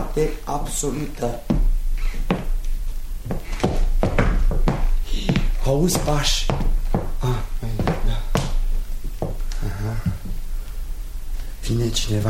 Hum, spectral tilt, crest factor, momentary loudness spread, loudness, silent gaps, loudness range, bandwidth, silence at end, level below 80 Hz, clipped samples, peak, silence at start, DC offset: none; -5 dB/octave; 18 dB; 13 LU; -25 LUFS; none; 6 LU; 15.5 kHz; 0 s; -22 dBFS; under 0.1%; -2 dBFS; 0 s; 1%